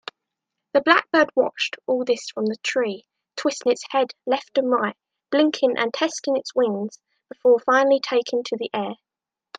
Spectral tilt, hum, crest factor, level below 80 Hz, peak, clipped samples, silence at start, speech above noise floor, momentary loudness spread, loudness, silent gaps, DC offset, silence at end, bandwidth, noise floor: -3.5 dB/octave; none; 22 dB; -76 dBFS; 0 dBFS; under 0.1%; 0.75 s; 67 dB; 11 LU; -22 LUFS; none; under 0.1%; 0.65 s; 9.4 kHz; -89 dBFS